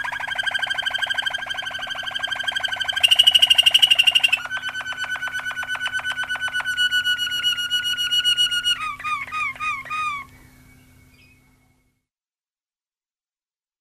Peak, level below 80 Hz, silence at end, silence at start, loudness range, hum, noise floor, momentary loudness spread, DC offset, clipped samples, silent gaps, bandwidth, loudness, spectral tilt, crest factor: -2 dBFS; -58 dBFS; 3.45 s; 0 s; 13 LU; none; under -90 dBFS; 14 LU; under 0.1%; under 0.1%; none; 15 kHz; -19 LUFS; 1.5 dB/octave; 20 dB